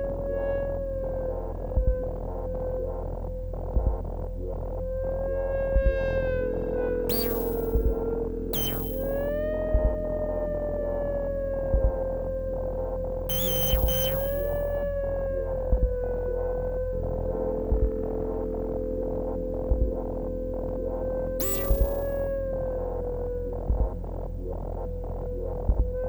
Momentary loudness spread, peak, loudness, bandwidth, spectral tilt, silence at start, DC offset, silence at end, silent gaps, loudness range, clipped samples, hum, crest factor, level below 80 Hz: 8 LU; -10 dBFS; -29 LUFS; over 20 kHz; -6 dB/octave; 0 s; under 0.1%; 0 s; none; 5 LU; under 0.1%; none; 18 dB; -32 dBFS